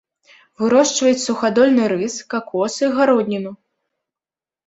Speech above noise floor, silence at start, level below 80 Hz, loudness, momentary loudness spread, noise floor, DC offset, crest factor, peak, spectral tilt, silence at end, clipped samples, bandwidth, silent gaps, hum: over 73 dB; 0.6 s; -64 dBFS; -17 LUFS; 10 LU; under -90 dBFS; under 0.1%; 16 dB; -2 dBFS; -4 dB/octave; 1.15 s; under 0.1%; 8.2 kHz; none; none